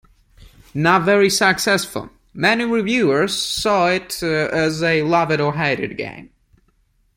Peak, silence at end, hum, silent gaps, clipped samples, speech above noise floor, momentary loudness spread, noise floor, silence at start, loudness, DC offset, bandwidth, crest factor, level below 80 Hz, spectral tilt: -2 dBFS; 0.95 s; none; none; under 0.1%; 43 dB; 12 LU; -61 dBFS; 0.75 s; -17 LUFS; under 0.1%; 16.5 kHz; 18 dB; -50 dBFS; -4 dB/octave